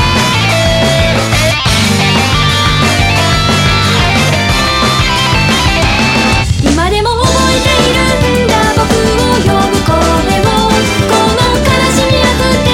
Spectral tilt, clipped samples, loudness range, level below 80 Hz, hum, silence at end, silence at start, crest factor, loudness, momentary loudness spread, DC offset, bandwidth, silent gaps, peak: -4.5 dB/octave; under 0.1%; 1 LU; -20 dBFS; none; 0 s; 0 s; 10 dB; -9 LUFS; 1 LU; under 0.1%; 17 kHz; none; 0 dBFS